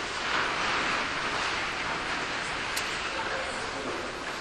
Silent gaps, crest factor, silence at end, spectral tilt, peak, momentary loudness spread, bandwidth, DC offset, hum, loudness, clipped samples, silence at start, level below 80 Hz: none; 20 dB; 0 s; -2 dB/octave; -12 dBFS; 6 LU; 12 kHz; under 0.1%; none; -29 LUFS; under 0.1%; 0 s; -52 dBFS